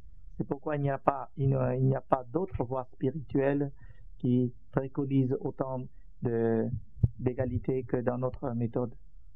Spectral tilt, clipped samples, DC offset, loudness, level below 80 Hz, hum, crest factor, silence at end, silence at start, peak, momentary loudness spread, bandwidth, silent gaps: -12 dB/octave; under 0.1%; 0.6%; -32 LUFS; -50 dBFS; none; 24 dB; 0.15 s; 0.05 s; -8 dBFS; 7 LU; 3.8 kHz; none